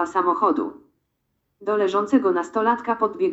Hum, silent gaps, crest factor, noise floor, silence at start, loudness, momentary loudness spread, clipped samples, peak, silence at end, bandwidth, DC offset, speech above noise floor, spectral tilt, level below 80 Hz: none; none; 16 dB; -74 dBFS; 0 s; -21 LUFS; 6 LU; under 0.1%; -6 dBFS; 0 s; 8 kHz; under 0.1%; 53 dB; -6 dB/octave; -66 dBFS